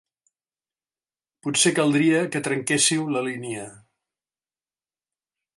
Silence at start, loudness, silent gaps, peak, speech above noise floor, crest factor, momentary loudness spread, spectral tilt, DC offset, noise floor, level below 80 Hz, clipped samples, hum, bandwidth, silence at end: 1.45 s; -21 LUFS; none; -6 dBFS; over 68 dB; 20 dB; 15 LU; -3 dB/octave; under 0.1%; under -90 dBFS; -72 dBFS; under 0.1%; none; 11.5 kHz; 1.8 s